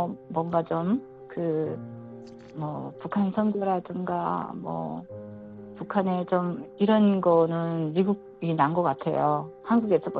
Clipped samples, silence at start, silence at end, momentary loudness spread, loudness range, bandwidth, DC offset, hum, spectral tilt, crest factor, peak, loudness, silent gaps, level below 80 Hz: under 0.1%; 0 s; 0 s; 19 LU; 6 LU; 4.7 kHz; under 0.1%; none; -10.5 dB/octave; 18 dB; -8 dBFS; -27 LUFS; none; -66 dBFS